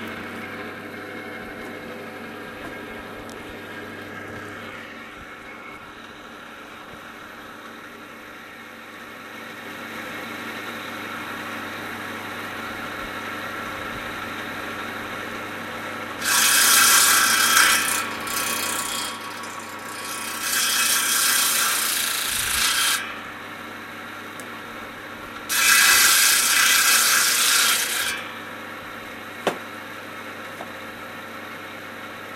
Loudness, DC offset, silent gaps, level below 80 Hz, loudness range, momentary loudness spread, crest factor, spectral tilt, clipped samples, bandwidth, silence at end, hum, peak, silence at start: -19 LUFS; under 0.1%; none; -58 dBFS; 20 LU; 23 LU; 24 dB; 0.5 dB/octave; under 0.1%; 16 kHz; 0 s; none; -2 dBFS; 0 s